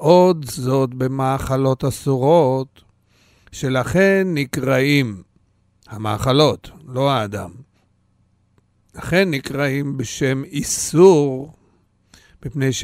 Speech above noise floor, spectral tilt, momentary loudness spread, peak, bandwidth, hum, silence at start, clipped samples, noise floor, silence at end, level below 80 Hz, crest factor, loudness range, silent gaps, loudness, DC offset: 43 dB; -5.5 dB/octave; 17 LU; 0 dBFS; 16 kHz; none; 0 s; under 0.1%; -61 dBFS; 0 s; -46 dBFS; 18 dB; 5 LU; none; -18 LUFS; under 0.1%